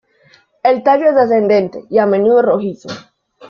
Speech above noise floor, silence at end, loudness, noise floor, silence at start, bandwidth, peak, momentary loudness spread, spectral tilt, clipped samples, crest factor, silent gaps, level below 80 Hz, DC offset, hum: 39 dB; 0.05 s; -13 LUFS; -51 dBFS; 0.65 s; 7.2 kHz; -2 dBFS; 14 LU; -7 dB/octave; under 0.1%; 12 dB; none; -60 dBFS; under 0.1%; none